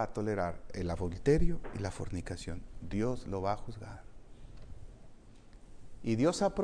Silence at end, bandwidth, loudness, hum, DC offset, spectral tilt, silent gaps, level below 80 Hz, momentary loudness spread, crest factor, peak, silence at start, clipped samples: 0 s; 10.5 kHz; -35 LUFS; none; under 0.1%; -6.5 dB/octave; none; -44 dBFS; 24 LU; 18 dB; -16 dBFS; 0 s; under 0.1%